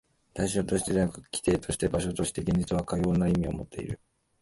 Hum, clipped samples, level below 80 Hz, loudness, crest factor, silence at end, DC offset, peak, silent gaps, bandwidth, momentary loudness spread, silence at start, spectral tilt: none; under 0.1%; -44 dBFS; -29 LUFS; 16 dB; 0.45 s; under 0.1%; -12 dBFS; none; 11.5 kHz; 11 LU; 0.35 s; -6 dB/octave